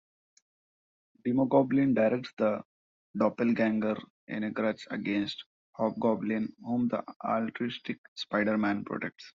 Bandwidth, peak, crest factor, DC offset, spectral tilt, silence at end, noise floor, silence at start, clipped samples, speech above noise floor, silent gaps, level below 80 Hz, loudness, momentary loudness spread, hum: 7.6 kHz; -10 dBFS; 20 dB; under 0.1%; -5 dB/octave; 0.05 s; under -90 dBFS; 1.25 s; under 0.1%; over 61 dB; 2.33-2.37 s, 2.65-3.14 s, 4.10-4.27 s, 5.46-5.73 s, 7.16-7.20 s, 7.98-8.16 s; -72 dBFS; -30 LUFS; 12 LU; none